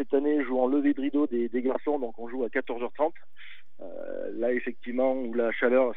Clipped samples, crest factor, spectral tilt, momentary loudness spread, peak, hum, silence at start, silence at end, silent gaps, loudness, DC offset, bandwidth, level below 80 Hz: under 0.1%; 16 dB; -8.5 dB/octave; 15 LU; -12 dBFS; none; 0 s; 0 s; none; -28 LUFS; 2%; 4 kHz; -84 dBFS